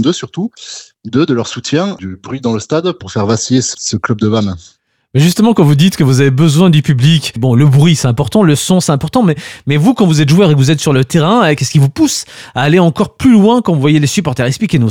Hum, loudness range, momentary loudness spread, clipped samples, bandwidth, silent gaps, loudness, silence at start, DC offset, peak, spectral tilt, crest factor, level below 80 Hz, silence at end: none; 6 LU; 10 LU; under 0.1%; 16.5 kHz; none; -11 LUFS; 0 s; under 0.1%; 0 dBFS; -6 dB/octave; 10 dB; -44 dBFS; 0 s